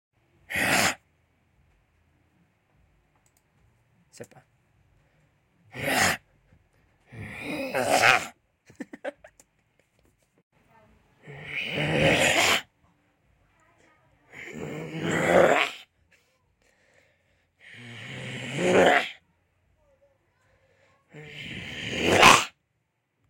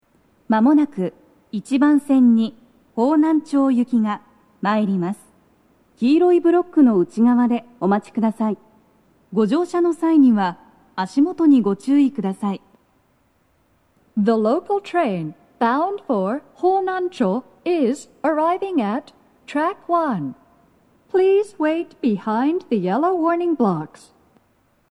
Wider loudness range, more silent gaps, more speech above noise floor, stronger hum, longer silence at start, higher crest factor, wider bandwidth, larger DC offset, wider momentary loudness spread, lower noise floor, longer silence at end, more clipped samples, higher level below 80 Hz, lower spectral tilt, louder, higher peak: first, 8 LU vs 4 LU; first, 10.43-10.51 s vs none; first, 50 dB vs 44 dB; neither; about the same, 0.5 s vs 0.5 s; first, 26 dB vs 14 dB; first, 16.5 kHz vs 11 kHz; neither; first, 24 LU vs 12 LU; first, -76 dBFS vs -62 dBFS; second, 0.8 s vs 1.05 s; neither; first, -58 dBFS vs -68 dBFS; second, -3 dB/octave vs -7.5 dB/octave; second, -23 LUFS vs -19 LUFS; about the same, -2 dBFS vs -4 dBFS